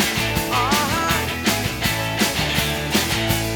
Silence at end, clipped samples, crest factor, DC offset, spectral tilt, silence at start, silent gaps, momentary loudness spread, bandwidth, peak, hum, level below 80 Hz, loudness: 0 s; under 0.1%; 16 dB; under 0.1%; -3 dB/octave; 0 s; none; 2 LU; over 20 kHz; -4 dBFS; none; -36 dBFS; -20 LUFS